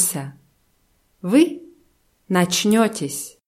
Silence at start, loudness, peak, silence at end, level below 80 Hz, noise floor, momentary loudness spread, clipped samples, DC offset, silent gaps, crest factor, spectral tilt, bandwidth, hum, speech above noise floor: 0 s; -19 LUFS; -4 dBFS; 0.15 s; -64 dBFS; -63 dBFS; 15 LU; under 0.1%; under 0.1%; none; 18 dB; -4 dB/octave; 16 kHz; none; 44 dB